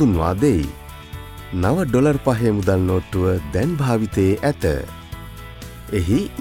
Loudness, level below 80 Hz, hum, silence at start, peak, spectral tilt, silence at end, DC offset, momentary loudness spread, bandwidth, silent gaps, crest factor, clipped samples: -20 LUFS; -36 dBFS; none; 0 s; -4 dBFS; -7.5 dB/octave; 0 s; under 0.1%; 18 LU; 16.5 kHz; none; 16 dB; under 0.1%